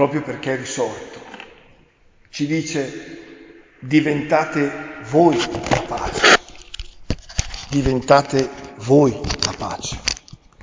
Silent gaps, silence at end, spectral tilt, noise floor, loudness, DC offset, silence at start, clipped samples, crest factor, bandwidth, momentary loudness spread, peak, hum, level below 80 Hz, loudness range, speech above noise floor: none; 0 s; -4.5 dB/octave; -53 dBFS; -19 LUFS; under 0.1%; 0 s; under 0.1%; 20 dB; 7.8 kHz; 21 LU; 0 dBFS; none; -38 dBFS; 9 LU; 35 dB